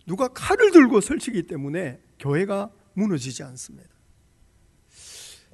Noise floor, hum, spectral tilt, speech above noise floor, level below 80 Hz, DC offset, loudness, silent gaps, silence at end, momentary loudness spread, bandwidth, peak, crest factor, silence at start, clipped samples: -59 dBFS; none; -5.5 dB/octave; 38 dB; -54 dBFS; under 0.1%; -21 LUFS; none; 0.2 s; 26 LU; 12 kHz; 0 dBFS; 22 dB; 0.05 s; under 0.1%